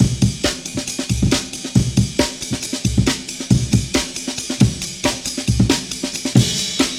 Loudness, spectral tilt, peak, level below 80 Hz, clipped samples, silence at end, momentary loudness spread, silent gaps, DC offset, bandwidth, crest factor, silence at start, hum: -19 LUFS; -4.5 dB/octave; 0 dBFS; -32 dBFS; under 0.1%; 0 s; 7 LU; none; under 0.1%; 16 kHz; 18 dB; 0 s; none